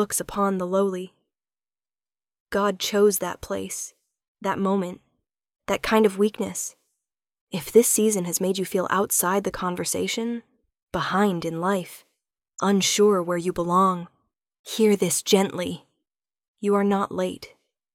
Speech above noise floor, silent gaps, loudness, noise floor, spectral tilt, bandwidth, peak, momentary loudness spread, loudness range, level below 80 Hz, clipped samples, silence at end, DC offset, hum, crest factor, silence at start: over 67 dB; 2.40-2.46 s, 4.28-4.35 s, 7.41-7.47 s, 10.83-10.87 s, 14.59-14.64 s, 16.48-16.54 s; -23 LUFS; under -90 dBFS; -4 dB/octave; 17 kHz; -4 dBFS; 13 LU; 4 LU; -56 dBFS; under 0.1%; 0.45 s; under 0.1%; none; 20 dB; 0 s